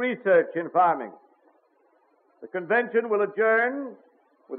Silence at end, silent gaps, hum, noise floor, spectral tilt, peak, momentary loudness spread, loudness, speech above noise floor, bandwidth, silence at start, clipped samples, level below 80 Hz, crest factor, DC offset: 0 s; none; none; -64 dBFS; -3.5 dB/octave; -10 dBFS; 14 LU; -24 LUFS; 41 dB; 4.3 kHz; 0 s; under 0.1%; under -90 dBFS; 16 dB; under 0.1%